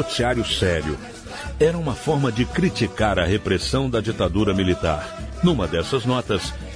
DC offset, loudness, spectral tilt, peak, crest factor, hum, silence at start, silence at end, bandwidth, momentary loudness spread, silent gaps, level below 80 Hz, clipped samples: under 0.1%; -22 LUFS; -5.5 dB/octave; -6 dBFS; 16 dB; none; 0 s; 0 s; 11 kHz; 7 LU; none; -36 dBFS; under 0.1%